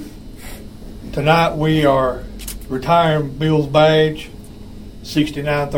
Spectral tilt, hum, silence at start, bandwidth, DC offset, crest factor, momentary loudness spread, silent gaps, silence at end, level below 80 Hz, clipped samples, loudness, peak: -6 dB/octave; none; 0 s; 16.5 kHz; 0.6%; 18 dB; 23 LU; none; 0 s; -36 dBFS; under 0.1%; -16 LUFS; 0 dBFS